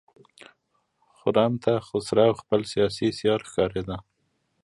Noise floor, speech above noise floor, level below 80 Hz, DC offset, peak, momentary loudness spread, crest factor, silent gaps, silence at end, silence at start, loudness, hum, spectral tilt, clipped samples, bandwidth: -72 dBFS; 48 dB; -54 dBFS; under 0.1%; -6 dBFS; 9 LU; 20 dB; none; 0.65 s; 1.25 s; -25 LUFS; none; -6 dB/octave; under 0.1%; 11.5 kHz